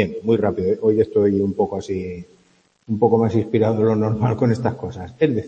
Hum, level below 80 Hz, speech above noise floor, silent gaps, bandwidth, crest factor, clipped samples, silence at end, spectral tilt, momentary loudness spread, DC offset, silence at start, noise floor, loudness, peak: none; -52 dBFS; 40 dB; none; 8.4 kHz; 18 dB; under 0.1%; 0 s; -9 dB/octave; 10 LU; under 0.1%; 0 s; -59 dBFS; -19 LUFS; -2 dBFS